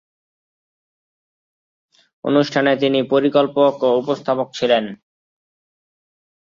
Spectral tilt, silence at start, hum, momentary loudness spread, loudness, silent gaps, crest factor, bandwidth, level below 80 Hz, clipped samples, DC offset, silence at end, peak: -6 dB/octave; 2.25 s; none; 5 LU; -17 LUFS; none; 18 dB; 7.4 kHz; -66 dBFS; under 0.1%; under 0.1%; 1.6 s; -2 dBFS